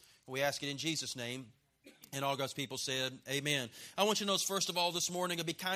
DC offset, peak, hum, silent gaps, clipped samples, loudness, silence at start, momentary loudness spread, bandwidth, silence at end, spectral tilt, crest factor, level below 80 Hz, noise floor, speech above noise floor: under 0.1%; -16 dBFS; none; none; under 0.1%; -35 LUFS; 0.25 s; 9 LU; 15.5 kHz; 0 s; -2.5 dB/octave; 22 dB; -78 dBFS; -61 dBFS; 25 dB